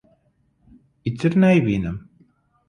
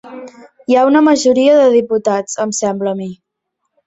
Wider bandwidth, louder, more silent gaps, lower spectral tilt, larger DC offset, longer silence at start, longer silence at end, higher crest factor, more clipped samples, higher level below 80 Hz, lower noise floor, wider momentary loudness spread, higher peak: first, 9.6 kHz vs 8.2 kHz; second, -20 LUFS vs -12 LUFS; neither; first, -8.5 dB/octave vs -4.5 dB/octave; neither; first, 1.05 s vs 0.05 s; about the same, 0.7 s vs 0.75 s; about the same, 16 dB vs 12 dB; neither; first, -48 dBFS vs -58 dBFS; second, -64 dBFS vs -73 dBFS; second, 15 LU vs 19 LU; second, -6 dBFS vs 0 dBFS